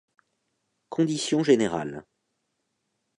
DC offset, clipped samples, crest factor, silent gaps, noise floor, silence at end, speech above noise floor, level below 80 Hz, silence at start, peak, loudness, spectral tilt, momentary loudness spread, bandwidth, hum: under 0.1%; under 0.1%; 20 dB; none; -78 dBFS; 1.15 s; 54 dB; -66 dBFS; 0.9 s; -8 dBFS; -25 LUFS; -5 dB/octave; 15 LU; 11 kHz; none